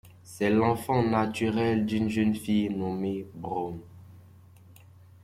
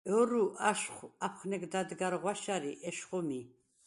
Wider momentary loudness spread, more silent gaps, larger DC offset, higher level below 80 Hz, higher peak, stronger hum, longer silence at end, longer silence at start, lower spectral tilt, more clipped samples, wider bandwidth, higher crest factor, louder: about the same, 10 LU vs 10 LU; neither; neither; first, -60 dBFS vs -80 dBFS; about the same, -12 dBFS vs -14 dBFS; neither; first, 1.05 s vs 0.4 s; about the same, 0.05 s vs 0.05 s; first, -7 dB/octave vs -4 dB/octave; neither; first, 15 kHz vs 11.5 kHz; about the same, 18 dB vs 22 dB; first, -28 LUFS vs -35 LUFS